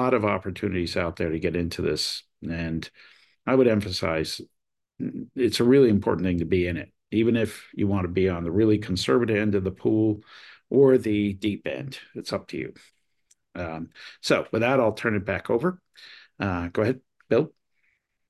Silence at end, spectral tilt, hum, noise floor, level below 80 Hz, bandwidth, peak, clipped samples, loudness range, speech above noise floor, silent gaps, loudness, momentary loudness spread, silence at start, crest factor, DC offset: 0.8 s; -6 dB/octave; none; -71 dBFS; -46 dBFS; 12.5 kHz; -6 dBFS; under 0.1%; 5 LU; 47 dB; none; -25 LUFS; 14 LU; 0 s; 18 dB; under 0.1%